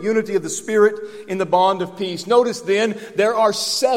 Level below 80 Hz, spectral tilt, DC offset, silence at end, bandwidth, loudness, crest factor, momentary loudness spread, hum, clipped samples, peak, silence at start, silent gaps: -68 dBFS; -3.5 dB/octave; under 0.1%; 0 s; 16.5 kHz; -19 LUFS; 16 dB; 8 LU; none; under 0.1%; -2 dBFS; 0 s; none